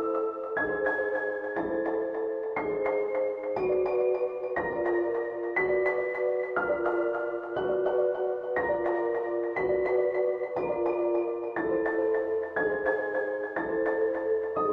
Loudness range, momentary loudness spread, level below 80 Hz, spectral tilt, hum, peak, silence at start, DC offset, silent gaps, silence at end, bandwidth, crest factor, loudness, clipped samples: 1 LU; 5 LU; -62 dBFS; -8 dB/octave; none; -14 dBFS; 0 s; under 0.1%; none; 0 s; 5.2 kHz; 14 dB; -29 LUFS; under 0.1%